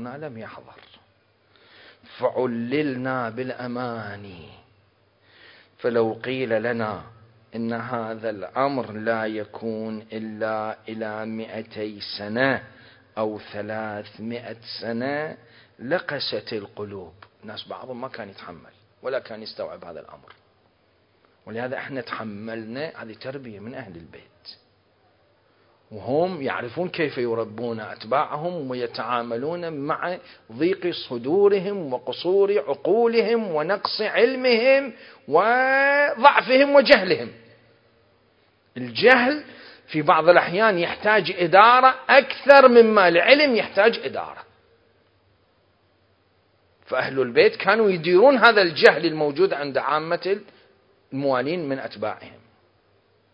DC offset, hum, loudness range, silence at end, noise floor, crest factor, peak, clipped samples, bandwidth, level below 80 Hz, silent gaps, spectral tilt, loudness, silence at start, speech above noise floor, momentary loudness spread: under 0.1%; none; 18 LU; 1.05 s; -63 dBFS; 22 dB; 0 dBFS; under 0.1%; 8 kHz; -66 dBFS; none; -7 dB/octave; -21 LUFS; 0 s; 41 dB; 20 LU